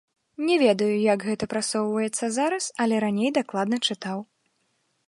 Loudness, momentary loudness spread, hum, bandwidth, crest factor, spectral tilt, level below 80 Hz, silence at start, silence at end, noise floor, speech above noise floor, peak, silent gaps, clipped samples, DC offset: -24 LUFS; 7 LU; none; 11.5 kHz; 18 dB; -4 dB/octave; -66 dBFS; 0.4 s; 0.85 s; -71 dBFS; 48 dB; -8 dBFS; none; under 0.1%; under 0.1%